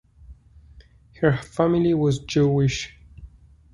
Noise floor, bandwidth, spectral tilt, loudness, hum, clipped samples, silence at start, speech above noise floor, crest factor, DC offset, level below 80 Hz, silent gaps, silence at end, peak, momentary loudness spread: -50 dBFS; 11 kHz; -6.5 dB/octave; -22 LUFS; none; under 0.1%; 0.3 s; 29 dB; 18 dB; under 0.1%; -46 dBFS; none; 0.45 s; -6 dBFS; 5 LU